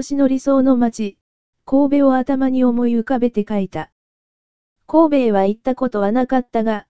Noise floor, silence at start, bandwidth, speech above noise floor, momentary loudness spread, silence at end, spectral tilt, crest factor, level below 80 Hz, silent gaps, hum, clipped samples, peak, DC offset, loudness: under -90 dBFS; 0 s; 8 kHz; over 74 dB; 8 LU; 0 s; -7 dB/octave; 16 dB; -50 dBFS; 1.21-1.53 s, 3.92-4.76 s; none; under 0.1%; -2 dBFS; 2%; -17 LUFS